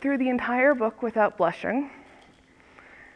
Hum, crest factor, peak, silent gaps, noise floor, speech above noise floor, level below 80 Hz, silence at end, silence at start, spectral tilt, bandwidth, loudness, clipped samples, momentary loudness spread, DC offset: none; 18 dB; -10 dBFS; none; -56 dBFS; 31 dB; -64 dBFS; 0.15 s; 0 s; -7 dB/octave; 9.4 kHz; -25 LUFS; under 0.1%; 8 LU; under 0.1%